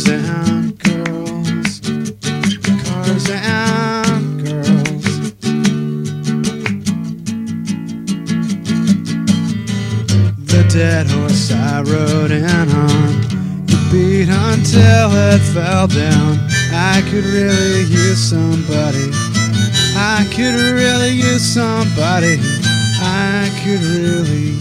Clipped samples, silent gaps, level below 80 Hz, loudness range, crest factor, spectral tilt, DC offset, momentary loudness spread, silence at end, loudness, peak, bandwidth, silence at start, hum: under 0.1%; none; -40 dBFS; 6 LU; 14 dB; -5 dB/octave; under 0.1%; 8 LU; 0 s; -14 LUFS; 0 dBFS; 14.5 kHz; 0 s; none